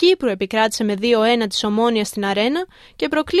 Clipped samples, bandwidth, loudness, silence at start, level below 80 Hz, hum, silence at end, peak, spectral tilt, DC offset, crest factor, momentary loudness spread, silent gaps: under 0.1%; 14 kHz; -19 LUFS; 0 s; -52 dBFS; none; 0 s; -4 dBFS; -4 dB/octave; under 0.1%; 14 dB; 6 LU; none